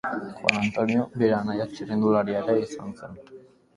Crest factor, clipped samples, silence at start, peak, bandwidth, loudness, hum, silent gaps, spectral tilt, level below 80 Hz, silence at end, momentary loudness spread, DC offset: 26 dB; under 0.1%; 0.05 s; 0 dBFS; 11 kHz; -25 LUFS; none; none; -6 dB/octave; -60 dBFS; 0.35 s; 16 LU; under 0.1%